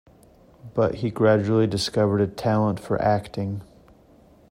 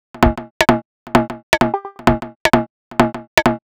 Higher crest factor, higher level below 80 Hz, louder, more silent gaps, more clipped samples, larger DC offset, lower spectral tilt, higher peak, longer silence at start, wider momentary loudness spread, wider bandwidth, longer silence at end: about the same, 18 dB vs 18 dB; second, -54 dBFS vs -30 dBFS; second, -23 LUFS vs -17 LUFS; second, none vs 0.51-0.60 s, 0.85-1.06 s, 1.43-1.52 s, 2.36-2.45 s, 2.70-2.91 s, 3.27-3.37 s; neither; neither; first, -6.5 dB/octave vs -5 dB/octave; second, -6 dBFS vs 0 dBFS; first, 0.65 s vs 0.15 s; first, 10 LU vs 3 LU; second, 14.5 kHz vs over 20 kHz; first, 0.9 s vs 0.1 s